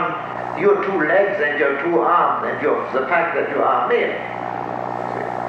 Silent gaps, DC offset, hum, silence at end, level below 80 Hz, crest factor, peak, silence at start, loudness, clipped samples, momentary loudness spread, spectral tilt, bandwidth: none; under 0.1%; none; 0 s; -60 dBFS; 14 dB; -4 dBFS; 0 s; -19 LUFS; under 0.1%; 9 LU; -7 dB/octave; 7.6 kHz